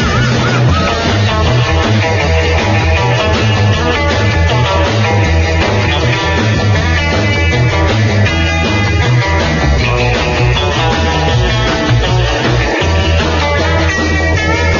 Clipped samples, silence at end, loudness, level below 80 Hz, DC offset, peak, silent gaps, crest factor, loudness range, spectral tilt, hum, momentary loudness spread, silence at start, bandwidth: under 0.1%; 0 s; -11 LUFS; -20 dBFS; under 0.1%; 0 dBFS; none; 10 dB; 1 LU; -5.5 dB/octave; none; 1 LU; 0 s; 7.2 kHz